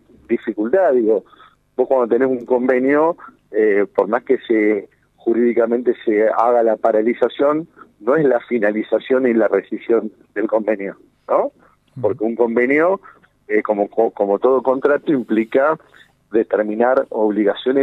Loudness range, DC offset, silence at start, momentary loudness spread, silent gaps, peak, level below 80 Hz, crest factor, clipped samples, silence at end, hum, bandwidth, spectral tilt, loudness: 3 LU; under 0.1%; 0.3 s; 8 LU; none; -2 dBFS; -64 dBFS; 16 dB; under 0.1%; 0 s; none; 4.1 kHz; -8 dB/octave; -18 LUFS